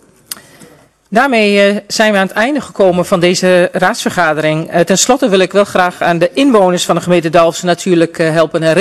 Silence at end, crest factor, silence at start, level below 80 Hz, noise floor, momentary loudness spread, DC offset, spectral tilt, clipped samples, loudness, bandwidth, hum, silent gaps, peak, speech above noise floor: 0 s; 12 dB; 0.3 s; -50 dBFS; -42 dBFS; 5 LU; 0.2%; -4.5 dB/octave; under 0.1%; -11 LUFS; 14 kHz; none; none; 0 dBFS; 32 dB